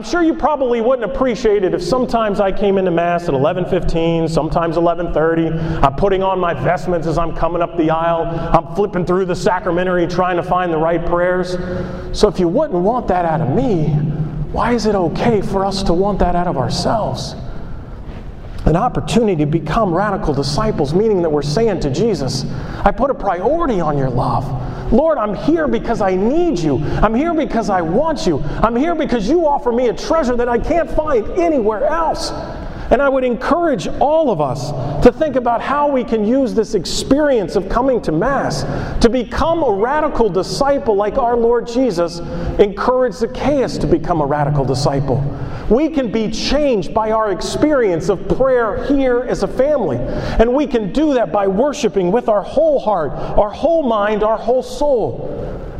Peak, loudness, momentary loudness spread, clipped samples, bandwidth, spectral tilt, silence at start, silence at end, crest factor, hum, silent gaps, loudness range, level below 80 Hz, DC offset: 0 dBFS; -16 LUFS; 5 LU; under 0.1%; 13 kHz; -6.5 dB/octave; 0 s; 0 s; 16 dB; none; none; 1 LU; -28 dBFS; under 0.1%